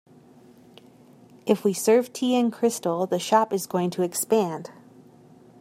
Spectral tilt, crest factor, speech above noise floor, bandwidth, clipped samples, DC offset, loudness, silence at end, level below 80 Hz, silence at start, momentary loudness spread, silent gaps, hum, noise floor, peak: -4.5 dB/octave; 20 dB; 29 dB; 16 kHz; under 0.1%; under 0.1%; -24 LUFS; 0.9 s; -76 dBFS; 1.45 s; 7 LU; none; none; -52 dBFS; -6 dBFS